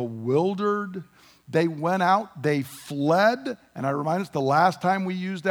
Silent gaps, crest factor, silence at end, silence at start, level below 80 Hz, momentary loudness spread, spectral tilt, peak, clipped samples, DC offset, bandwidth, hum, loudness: none; 18 dB; 0 s; 0 s; -72 dBFS; 10 LU; -6.5 dB/octave; -6 dBFS; under 0.1%; under 0.1%; over 20 kHz; none; -24 LUFS